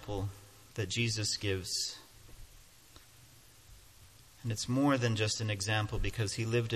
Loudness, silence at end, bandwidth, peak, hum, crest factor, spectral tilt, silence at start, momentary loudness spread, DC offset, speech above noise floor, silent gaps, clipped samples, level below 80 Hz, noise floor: -33 LUFS; 0 s; 14 kHz; -16 dBFS; none; 18 dB; -4 dB/octave; 0 s; 13 LU; under 0.1%; 26 dB; none; under 0.1%; -50 dBFS; -59 dBFS